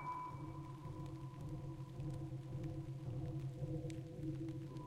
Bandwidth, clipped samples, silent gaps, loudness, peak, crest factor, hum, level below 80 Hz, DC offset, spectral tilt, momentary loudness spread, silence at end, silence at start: 12 kHz; under 0.1%; none; -48 LUFS; -34 dBFS; 14 dB; none; -60 dBFS; under 0.1%; -8.5 dB/octave; 5 LU; 0 s; 0 s